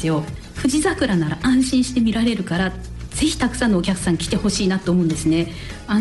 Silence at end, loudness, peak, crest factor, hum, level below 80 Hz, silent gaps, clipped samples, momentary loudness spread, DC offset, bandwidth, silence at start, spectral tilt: 0 s; -20 LUFS; -8 dBFS; 12 dB; none; -36 dBFS; none; under 0.1%; 6 LU; under 0.1%; 12 kHz; 0 s; -5 dB/octave